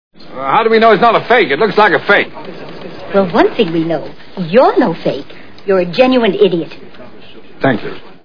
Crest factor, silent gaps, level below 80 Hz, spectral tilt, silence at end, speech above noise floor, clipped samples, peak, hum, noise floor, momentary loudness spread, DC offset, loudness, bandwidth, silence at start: 14 dB; none; -50 dBFS; -7.5 dB/octave; 0 s; 26 dB; 0.3%; 0 dBFS; none; -38 dBFS; 19 LU; 3%; -12 LUFS; 5.4 kHz; 0.1 s